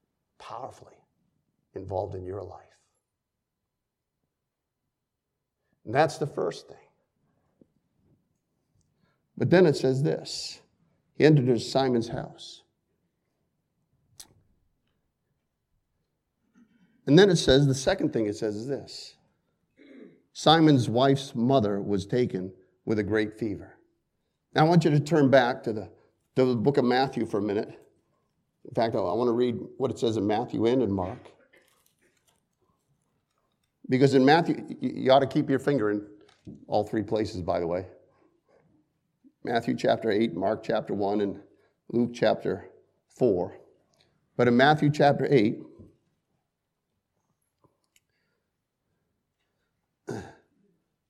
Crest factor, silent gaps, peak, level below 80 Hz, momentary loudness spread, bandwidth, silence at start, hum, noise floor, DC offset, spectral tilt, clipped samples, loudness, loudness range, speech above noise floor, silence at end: 24 dB; none; -4 dBFS; -60 dBFS; 19 LU; 12.5 kHz; 0.4 s; none; -84 dBFS; under 0.1%; -6.5 dB/octave; under 0.1%; -25 LUFS; 9 LU; 60 dB; 0.8 s